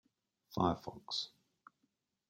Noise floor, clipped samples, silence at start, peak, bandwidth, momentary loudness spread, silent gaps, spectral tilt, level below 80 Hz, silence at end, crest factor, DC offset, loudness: -83 dBFS; under 0.1%; 0.5 s; -18 dBFS; 16.5 kHz; 11 LU; none; -5.5 dB/octave; -70 dBFS; 1 s; 24 dB; under 0.1%; -39 LUFS